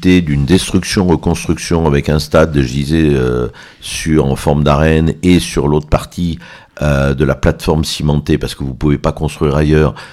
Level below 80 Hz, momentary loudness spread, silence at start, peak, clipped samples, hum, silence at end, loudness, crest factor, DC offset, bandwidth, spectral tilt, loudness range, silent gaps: -24 dBFS; 8 LU; 0 s; 0 dBFS; under 0.1%; none; 0 s; -13 LUFS; 12 dB; under 0.1%; 14.5 kHz; -6 dB/octave; 2 LU; none